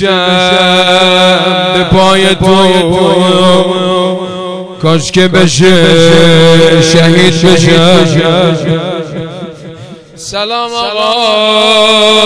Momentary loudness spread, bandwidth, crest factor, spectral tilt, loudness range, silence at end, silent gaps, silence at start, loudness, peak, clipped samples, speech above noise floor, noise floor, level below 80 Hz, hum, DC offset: 12 LU; 11 kHz; 8 dB; -4.5 dB/octave; 6 LU; 0 s; none; 0 s; -6 LUFS; 0 dBFS; 7%; 22 dB; -28 dBFS; -36 dBFS; none; under 0.1%